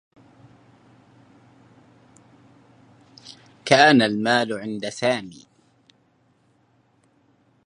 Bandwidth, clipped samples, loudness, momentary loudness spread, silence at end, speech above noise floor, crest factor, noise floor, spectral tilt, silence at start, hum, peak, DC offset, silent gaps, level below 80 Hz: 11 kHz; under 0.1%; -19 LUFS; 29 LU; 2.35 s; 43 dB; 26 dB; -63 dBFS; -4.5 dB/octave; 3.25 s; none; 0 dBFS; under 0.1%; none; -68 dBFS